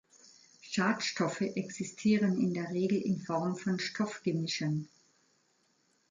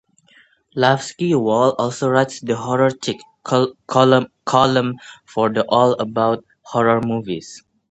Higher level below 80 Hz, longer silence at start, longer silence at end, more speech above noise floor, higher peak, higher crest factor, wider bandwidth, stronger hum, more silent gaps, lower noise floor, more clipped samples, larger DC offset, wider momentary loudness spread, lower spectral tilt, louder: second, -76 dBFS vs -58 dBFS; about the same, 0.65 s vs 0.75 s; first, 1.25 s vs 0.35 s; first, 41 dB vs 36 dB; second, -16 dBFS vs 0 dBFS; about the same, 16 dB vs 18 dB; about the same, 9.4 kHz vs 8.8 kHz; neither; neither; first, -73 dBFS vs -54 dBFS; neither; neither; second, 8 LU vs 11 LU; about the same, -5.5 dB/octave vs -5.5 dB/octave; second, -33 LUFS vs -18 LUFS